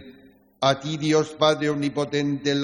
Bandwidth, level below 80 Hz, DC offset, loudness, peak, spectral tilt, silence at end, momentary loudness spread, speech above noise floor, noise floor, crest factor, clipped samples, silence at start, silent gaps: 16 kHz; -62 dBFS; under 0.1%; -23 LUFS; -6 dBFS; -5 dB/octave; 0 s; 4 LU; 31 dB; -53 dBFS; 18 dB; under 0.1%; 0 s; none